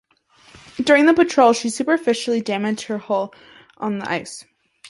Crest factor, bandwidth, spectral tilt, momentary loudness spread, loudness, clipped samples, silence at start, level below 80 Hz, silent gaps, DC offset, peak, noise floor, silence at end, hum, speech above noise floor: 18 dB; 11.5 kHz; -4 dB/octave; 16 LU; -19 LUFS; under 0.1%; 0.75 s; -62 dBFS; none; under 0.1%; -2 dBFS; -54 dBFS; 0 s; none; 35 dB